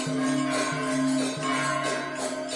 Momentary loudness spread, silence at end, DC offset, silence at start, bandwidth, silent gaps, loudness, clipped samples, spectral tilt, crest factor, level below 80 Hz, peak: 4 LU; 0 s; under 0.1%; 0 s; 11.5 kHz; none; -27 LUFS; under 0.1%; -4 dB/octave; 12 dB; -66 dBFS; -16 dBFS